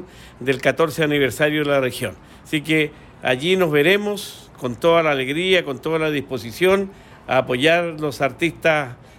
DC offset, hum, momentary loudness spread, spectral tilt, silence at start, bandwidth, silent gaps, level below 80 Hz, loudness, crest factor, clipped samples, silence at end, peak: under 0.1%; none; 11 LU; -5 dB/octave; 0 s; 17 kHz; none; -52 dBFS; -20 LUFS; 16 dB; under 0.1%; 0.25 s; -4 dBFS